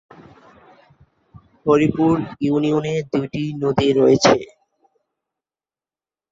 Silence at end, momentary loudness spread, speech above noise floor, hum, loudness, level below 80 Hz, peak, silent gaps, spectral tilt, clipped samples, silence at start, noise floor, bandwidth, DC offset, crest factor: 1.85 s; 9 LU; over 73 dB; none; -18 LUFS; -52 dBFS; 0 dBFS; none; -6 dB/octave; under 0.1%; 0.2 s; under -90 dBFS; 7.8 kHz; under 0.1%; 20 dB